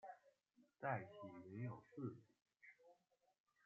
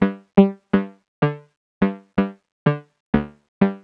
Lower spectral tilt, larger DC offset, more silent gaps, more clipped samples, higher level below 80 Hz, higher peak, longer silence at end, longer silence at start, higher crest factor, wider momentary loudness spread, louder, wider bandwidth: second, -7.5 dB/octave vs -10.5 dB/octave; neither; second, none vs 1.08-1.22 s, 1.56-1.81 s, 2.52-2.66 s, 3.00-3.13 s, 3.48-3.61 s; neither; second, under -90 dBFS vs -46 dBFS; second, -30 dBFS vs -2 dBFS; first, 0.7 s vs 0.05 s; about the same, 0.05 s vs 0 s; about the same, 24 dB vs 20 dB; first, 19 LU vs 13 LU; second, -52 LUFS vs -22 LUFS; first, 7.2 kHz vs 4.7 kHz